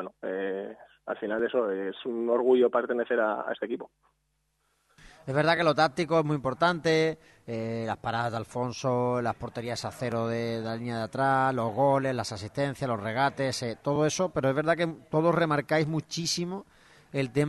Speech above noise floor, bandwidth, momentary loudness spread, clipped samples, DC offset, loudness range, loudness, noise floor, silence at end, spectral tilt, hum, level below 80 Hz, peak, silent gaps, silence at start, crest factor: 47 dB; 12 kHz; 11 LU; under 0.1%; under 0.1%; 3 LU; -28 LUFS; -75 dBFS; 0 s; -5.5 dB/octave; none; -64 dBFS; -8 dBFS; none; 0 s; 20 dB